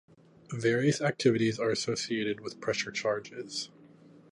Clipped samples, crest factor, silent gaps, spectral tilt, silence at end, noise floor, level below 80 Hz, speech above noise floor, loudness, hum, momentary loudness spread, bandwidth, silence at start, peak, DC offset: under 0.1%; 20 dB; none; -4.5 dB/octave; 0.65 s; -56 dBFS; -70 dBFS; 26 dB; -30 LUFS; none; 11 LU; 11.5 kHz; 0.5 s; -12 dBFS; under 0.1%